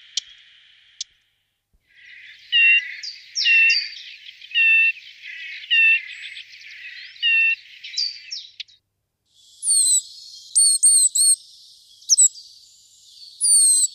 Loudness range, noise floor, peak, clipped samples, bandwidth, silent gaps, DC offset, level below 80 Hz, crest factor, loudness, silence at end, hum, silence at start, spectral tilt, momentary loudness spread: 6 LU; -74 dBFS; -6 dBFS; under 0.1%; 15 kHz; none; under 0.1%; -78 dBFS; 16 dB; -15 LUFS; 0.05 s; none; 1 s; 8.5 dB/octave; 23 LU